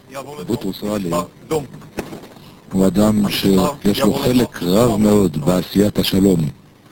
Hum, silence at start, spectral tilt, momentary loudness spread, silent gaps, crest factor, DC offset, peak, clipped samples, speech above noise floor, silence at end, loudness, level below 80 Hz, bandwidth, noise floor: none; 0.1 s; -6 dB/octave; 16 LU; none; 16 dB; under 0.1%; 0 dBFS; under 0.1%; 24 dB; 0.4 s; -17 LUFS; -40 dBFS; 17 kHz; -40 dBFS